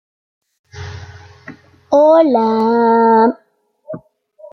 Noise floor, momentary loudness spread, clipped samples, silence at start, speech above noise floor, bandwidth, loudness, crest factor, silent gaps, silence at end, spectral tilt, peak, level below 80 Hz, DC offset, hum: -43 dBFS; 22 LU; under 0.1%; 0.75 s; 32 dB; 6.6 kHz; -12 LUFS; 14 dB; none; 0.05 s; -7.5 dB/octave; -2 dBFS; -58 dBFS; under 0.1%; none